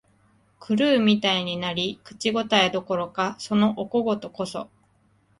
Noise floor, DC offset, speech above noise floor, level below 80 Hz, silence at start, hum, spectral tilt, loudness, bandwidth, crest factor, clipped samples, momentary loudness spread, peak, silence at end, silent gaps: -63 dBFS; under 0.1%; 39 dB; -64 dBFS; 0.6 s; none; -5 dB/octave; -23 LUFS; 11.5 kHz; 20 dB; under 0.1%; 12 LU; -4 dBFS; 0.75 s; none